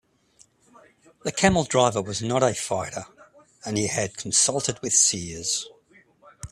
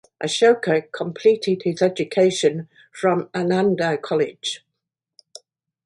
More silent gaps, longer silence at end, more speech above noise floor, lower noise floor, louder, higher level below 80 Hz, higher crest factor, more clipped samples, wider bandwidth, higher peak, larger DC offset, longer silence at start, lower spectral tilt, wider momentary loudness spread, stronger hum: neither; second, 0.05 s vs 1.3 s; second, 36 dB vs 61 dB; second, -59 dBFS vs -81 dBFS; second, -23 LUFS vs -20 LUFS; first, -52 dBFS vs -68 dBFS; first, 24 dB vs 16 dB; neither; first, 14 kHz vs 11.5 kHz; about the same, -2 dBFS vs -4 dBFS; neither; first, 1.25 s vs 0.2 s; second, -3 dB/octave vs -5 dB/octave; first, 15 LU vs 11 LU; neither